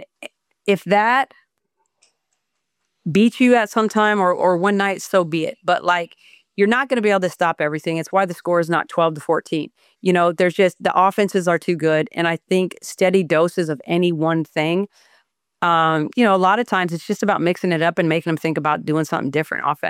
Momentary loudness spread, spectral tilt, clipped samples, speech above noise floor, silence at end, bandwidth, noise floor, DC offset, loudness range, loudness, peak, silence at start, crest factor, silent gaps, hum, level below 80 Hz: 7 LU; -5.5 dB/octave; under 0.1%; 57 dB; 0 s; 16 kHz; -76 dBFS; under 0.1%; 2 LU; -19 LUFS; -4 dBFS; 0 s; 16 dB; none; none; -68 dBFS